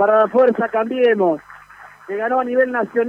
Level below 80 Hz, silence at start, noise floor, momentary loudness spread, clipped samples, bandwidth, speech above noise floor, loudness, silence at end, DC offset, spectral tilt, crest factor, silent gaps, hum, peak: -64 dBFS; 0 s; -42 dBFS; 9 LU; under 0.1%; 5.2 kHz; 26 dB; -17 LUFS; 0 s; under 0.1%; -7 dB/octave; 14 dB; none; 50 Hz at -65 dBFS; -4 dBFS